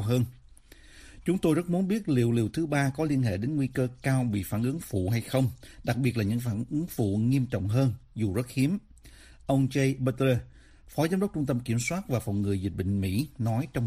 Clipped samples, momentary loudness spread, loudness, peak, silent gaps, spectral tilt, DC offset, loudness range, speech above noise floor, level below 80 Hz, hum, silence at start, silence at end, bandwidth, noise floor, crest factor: under 0.1%; 5 LU; -28 LUFS; -12 dBFS; none; -7 dB/octave; under 0.1%; 2 LU; 25 dB; -52 dBFS; none; 0 s; 0 s; 15.5 kHz; -53 dBFS; 16 dB